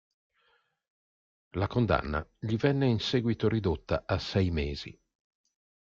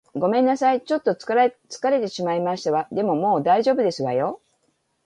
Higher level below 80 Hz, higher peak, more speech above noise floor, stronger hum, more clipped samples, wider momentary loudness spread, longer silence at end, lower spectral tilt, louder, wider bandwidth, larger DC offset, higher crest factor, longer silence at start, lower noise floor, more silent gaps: first, -48 dBFS vs -70 dBFS; second, -12 dBFS vs -6 dBFS; second, 43 dB vs 48 dB; neither; neither; first, 9 LU vs 6 LU; first, 0.95 s vs 0.7 s; about the same, -7 dB/octave vs -6 dB/octave; second, -30 LUFS vs -22 LUFS; second, 7.4 kHz vs 10.5 kHz; neither; about the same, 20 dB vs 16 dB; first, 1.55 s vs 0.15 s; about the same, -71 dBFS vs -69 dBFS; neither